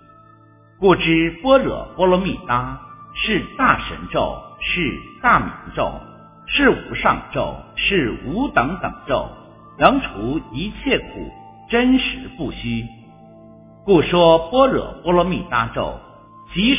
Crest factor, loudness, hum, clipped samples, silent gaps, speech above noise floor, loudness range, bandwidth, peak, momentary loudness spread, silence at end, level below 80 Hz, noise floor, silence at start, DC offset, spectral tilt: 20 dB; -19 LUFS; none; under 0.1%; none; 30 dB; 4 LU; 4 kHz; 0 dBFS; 13 LU; 0 s; -38 dBFS; -49 dBFS; 0.8 s; under 0.1%; -9.5 dB/octave